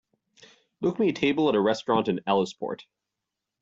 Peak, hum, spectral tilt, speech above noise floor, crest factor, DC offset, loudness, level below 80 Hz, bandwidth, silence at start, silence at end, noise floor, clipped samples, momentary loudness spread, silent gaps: -10 dBFS; none; -6 dB/octave; 61 dB; 18 dB; under 0.1%; -26 LUFS; -66 dBFS; 7.8 kHz; 0.8 s; 0.8 s; -86 dBFS; under 0.1%; 11 LU; none